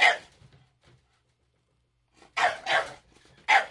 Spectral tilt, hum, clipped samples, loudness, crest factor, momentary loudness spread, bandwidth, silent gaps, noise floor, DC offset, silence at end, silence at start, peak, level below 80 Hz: -0.5 dB/octave; none; under 0.1%; -26 LUFS; 24 dB; 15 LU; 11.5 kHz; none; -72 dBFS; under 0.1%; 0 s; 0 s; -6 dBFS; -68 dBFS